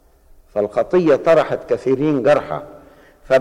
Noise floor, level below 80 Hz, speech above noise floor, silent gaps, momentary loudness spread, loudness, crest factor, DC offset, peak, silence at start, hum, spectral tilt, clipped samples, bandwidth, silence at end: -48 dBFS; -50 dBFS; 32 dB; none; 12 LU; -17 LUFS; 12 dB; under 0.1%; -4 dBFS; 0.55 s; none; -7 dB/octave; under 0.1%; 11 kHz; 0 s